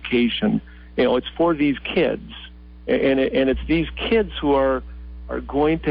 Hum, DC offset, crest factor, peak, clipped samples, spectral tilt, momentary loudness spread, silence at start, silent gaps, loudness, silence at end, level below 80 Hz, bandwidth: none; under 0.1%; 12 dB; -8 dBFS; under 0.1%; -11 dB/octave; 14 LU; 0 s; none; -21 LUFS; 0 s; -38 dBFS; 5.2 kHz